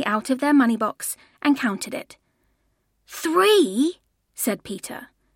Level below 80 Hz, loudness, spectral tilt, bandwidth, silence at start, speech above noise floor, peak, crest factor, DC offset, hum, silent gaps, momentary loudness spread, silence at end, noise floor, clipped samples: -68 dBFS; -22 LUFS; -3.5 dB/octave; 16.5 kHz; 0 s; 48 dB; -6 dBFS; 18 dB; under 0.1%; none; none; 18 LU; 0.3 s; -69 dBFS; under 0.1%